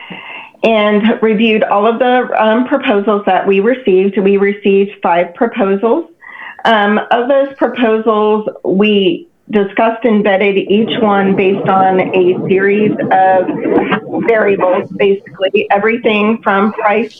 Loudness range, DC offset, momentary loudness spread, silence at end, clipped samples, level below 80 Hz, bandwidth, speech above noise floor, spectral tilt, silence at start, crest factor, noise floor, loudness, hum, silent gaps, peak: 2 LU; under 0.1%; 5 LU; 0.1 s; under 0.1%; -56 dBFS; 5.2 kHz; 20 dB; -8 dB/octave; 0 s; 12 dB; -31 dBFS; -12 LUFS; none; none; 0 dBFS